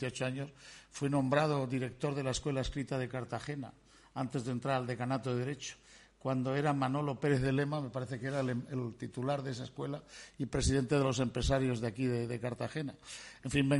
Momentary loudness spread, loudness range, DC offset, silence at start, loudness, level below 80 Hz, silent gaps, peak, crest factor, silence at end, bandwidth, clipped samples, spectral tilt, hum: 12 LU; 3 LU; under 0.1%; 0 s; -35 LUFS; -52 dBFS; none; -16 dBFS; 18 dB; 0 s; 11.5 kHz; under 0.1%; -6 dB/octave; none